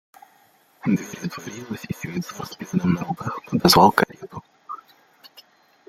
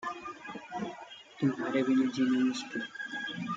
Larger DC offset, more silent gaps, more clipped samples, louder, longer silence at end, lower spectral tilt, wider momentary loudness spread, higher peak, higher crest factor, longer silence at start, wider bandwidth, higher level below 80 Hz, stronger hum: neither; neither; neither; first, -22 LUFS vs -32 LUFS; first, 0.6 s vs 0 s; about the same, -5 dB/octave vs -5.5 dB/octave; first, 24 LU vs 14 LU; first, 0 dBFS vs -18 dBFS; first, 24 dB vs 16 dB; first, 0.85 s vs 0 s; first, 16.5 kHz vs 7.8 kHz; first, -54 dBFS vs -76 dBFS; neither